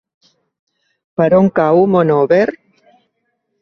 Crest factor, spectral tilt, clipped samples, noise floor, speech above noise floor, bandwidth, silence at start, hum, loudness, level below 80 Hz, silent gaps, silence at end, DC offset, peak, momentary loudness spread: 14 dB; -9.5 dB/octave; under 0.1%; -69 dBFS; 57 dB; 6.4 kHz; 1.2 s; none; -13 LUFS; -54 dBFS; none; 1.05 s; under 0.1%; 0 dBFS; 7 LU